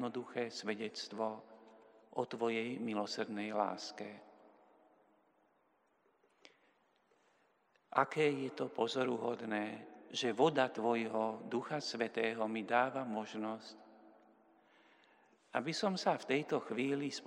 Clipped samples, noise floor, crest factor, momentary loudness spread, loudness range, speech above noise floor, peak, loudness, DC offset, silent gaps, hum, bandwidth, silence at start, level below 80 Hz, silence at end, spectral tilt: under 0.1%; -76 dBFS; 26 dB; 10 LU; 8 LU; 38 dB; -14 dBFS; -38 LUFS; under 0.1%; none; none; 11 kHz; 0 s; under -90 dBFS; 0 s; -4.5 dB/octave